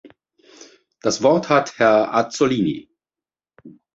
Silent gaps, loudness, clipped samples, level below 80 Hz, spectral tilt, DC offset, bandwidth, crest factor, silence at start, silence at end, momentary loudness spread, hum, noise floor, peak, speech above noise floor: none; -18 LUFS; under 0.1%; -60 dBFS; -5 dB/octave; under 0.1%; 8 kHz; 18 dB; 1.05 s; 0.25 s; 9 LU; none; under -90 dBFS; -2 dBFS; over 72 dB